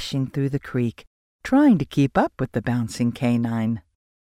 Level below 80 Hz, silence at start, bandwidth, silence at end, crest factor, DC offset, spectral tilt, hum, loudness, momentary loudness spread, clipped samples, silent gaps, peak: -50 dBFS; 0 s; 14.5 kHz; 0.45 s; 16 dB; under 0.1%; -7 dB/octave; none; -22 LUFS; 9 LU; under 0.1%; 1.07-1.39 s; -6 dBFS